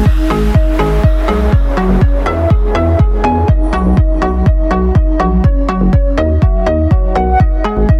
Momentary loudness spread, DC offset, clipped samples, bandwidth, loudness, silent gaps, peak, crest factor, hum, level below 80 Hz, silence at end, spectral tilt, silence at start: 1 LU; under 0.1%; under 0.1%; 7 kHz; -12 LUFS; none; 0 dBFS; 10 dB; none; -12 dBFS; 0 s; -8.5 dB/octave; 0 s